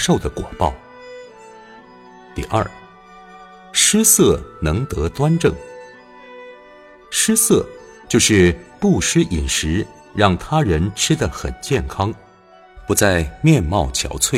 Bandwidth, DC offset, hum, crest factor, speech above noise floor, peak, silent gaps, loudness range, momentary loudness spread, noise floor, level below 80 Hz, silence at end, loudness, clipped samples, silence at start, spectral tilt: 16.5 kHz; under 0.1%; none; 18 dB; 30 dB; 0 dBFS; none; 5 LU; 20 LU; -47 dBFS; -34 dBFS; 0 s; -17 LUFS; under 0.1%; 0 s; -4 dB/octave